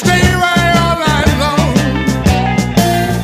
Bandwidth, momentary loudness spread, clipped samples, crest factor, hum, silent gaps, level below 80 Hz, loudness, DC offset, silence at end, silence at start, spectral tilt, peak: 16 kHz; 3 LU; under 0.1%; 12 dB; none; none; -24 dBFS; -12 LUFS; under 0.1%; 0 s; 0 s; -5 dB/octave; 0 dBFS